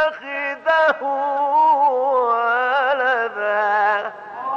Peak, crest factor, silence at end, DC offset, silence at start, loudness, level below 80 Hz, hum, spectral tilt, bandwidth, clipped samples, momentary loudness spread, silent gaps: -8 dBFS; 12 dB; 0 s; under 0.1%; 0 s; -18 LUFS; -70 dBFS; none; -3.5 dB/octave; 7.2 kHz; under 0.1%; 8 LU; none